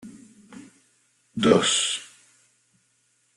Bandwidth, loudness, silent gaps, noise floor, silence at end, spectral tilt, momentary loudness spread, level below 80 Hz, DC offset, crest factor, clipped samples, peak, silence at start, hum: 12.5 kHz; -21 LUFS; none; -67 dBFS; 1.3 s; -3 dB/octave; 20 LU; -64 dBFS; under 0.1%; 26 dB; under 0.1%; -2 dBFS; 0.05 s; none